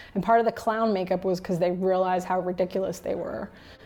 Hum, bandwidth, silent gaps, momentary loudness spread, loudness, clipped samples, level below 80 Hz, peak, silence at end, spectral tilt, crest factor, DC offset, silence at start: none; 18 kHz; none; 9 LU; -26 LUFS; under 0.1%; -56 dBFS; -10 dBFS; 0 s; -6.5 dB/octave; 16 dB; under 0.1%; 0 s